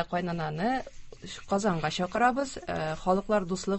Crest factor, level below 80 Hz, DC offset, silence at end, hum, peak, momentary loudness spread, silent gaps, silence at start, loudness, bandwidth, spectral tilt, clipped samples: 18 dB; -52 dBFS; under 0.1%; 0 s; none; -12 dBFS; 14 LU; none; 0 s; -29 LUFS; 8.6 kHz; -5.5 dB/octave; under 0.1%